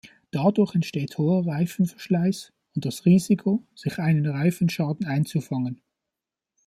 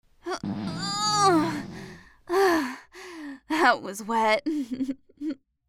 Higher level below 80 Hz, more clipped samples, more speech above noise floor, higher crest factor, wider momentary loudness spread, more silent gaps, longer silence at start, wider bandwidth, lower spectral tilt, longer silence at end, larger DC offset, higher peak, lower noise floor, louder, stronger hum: about the same, -64 dBFS vs -60 dBFS; neither; first, 64 dB vs 19 dB; about the same, 16 dB vs 20 dB; second, 11 LU vs 19 LU; neither; about the same, 0.35 s vs 0.25 s; second, 14.5 kHz vs 16.5 kHz; first, -7.5 dB/octave vs -3.5 dB/octave; first, 0.9 s vs 0.35 s; neither; about the same, -8 dBFS vs -6 dBFS; first, -87 dBFS vs -45 dBFS; about the same, -24 LUFS vs -26 LUFS; neither